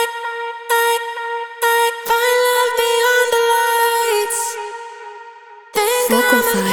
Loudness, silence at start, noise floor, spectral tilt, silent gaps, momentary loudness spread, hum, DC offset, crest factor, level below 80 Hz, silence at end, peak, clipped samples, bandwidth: -16 LUFS; 0 s; -39 dBFS; -1.5 dB/octave; none; 13 LU; none; under 0.1%; 16 dB; -60 dBFS; 0 s; -2 dBFS; under 0.1%; over 20 kHz